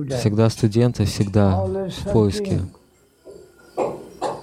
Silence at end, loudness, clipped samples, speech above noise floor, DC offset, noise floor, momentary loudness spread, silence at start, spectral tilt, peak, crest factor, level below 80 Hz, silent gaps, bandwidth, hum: 0 s; -21 LUFS; under 0.1%; 31 dB; under 0.1%; -50 dBFS; 10 LU; 0 s; -7 dB/octave; -2 dBFS; 18 dB; -44 dBFS; none; 14 kHz; none